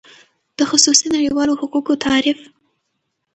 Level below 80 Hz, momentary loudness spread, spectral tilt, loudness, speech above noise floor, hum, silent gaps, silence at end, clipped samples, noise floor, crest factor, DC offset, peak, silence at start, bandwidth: -54 dBFS; 10 LU; -1 dB/octave; -15 LUFS; 57 dB; none; none; 0.9 s; under 0.1%; -73 dBFS; 18 dB; under 0.1%; 0 dBFS; 0.6 s; 9 kHz